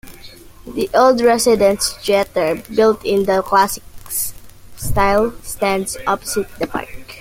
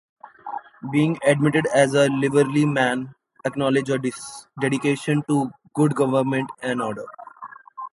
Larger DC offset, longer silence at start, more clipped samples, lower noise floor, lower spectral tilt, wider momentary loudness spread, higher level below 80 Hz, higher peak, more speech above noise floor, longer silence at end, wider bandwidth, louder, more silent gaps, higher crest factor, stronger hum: neither; second, 0.05 s vs 0.25 s; neither; about the same, -39 dBFS vs -42 dBFS; second, -3.5 dB/octave vs -6 dB/octave; second, 11 LU vs 18 LU; first, -38 dBFS vs -62 dBFS; about the same, -2 dBFS vs -4 dBFS; about the same, 23 dB vs 21 dB; about the same, 0 s vs 0.05 s; first, 17 kHz vs 11.5 kHz; first, -17 LUFS vs -21 LUFS; neither; about the same, 16 dB vs 18 dB; neither